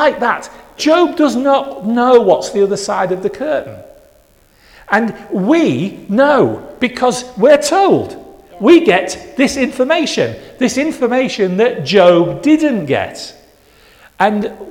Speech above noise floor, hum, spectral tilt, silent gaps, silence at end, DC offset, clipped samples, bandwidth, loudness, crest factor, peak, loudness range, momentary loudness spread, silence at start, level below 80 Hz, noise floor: 37 dB; none; -5 dB/octave; none; 0 s; under 0.1%; under 0.1%; 16 kHz; -13 LUFS; 14 dB; 0 dBFS; 4 LU; 10 LU; 0 s; -50 dBFS; -49 dBFS